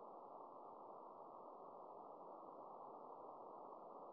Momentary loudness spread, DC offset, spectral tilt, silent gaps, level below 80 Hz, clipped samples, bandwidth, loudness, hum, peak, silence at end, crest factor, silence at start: 1 LU; under 0.1%; -5 dB/octave; none; under -90 dBFS; under 0.1%; 3.9 kHz; -58 LUFS; none; -44 dBFS; 0 s; 14 dB; 0 s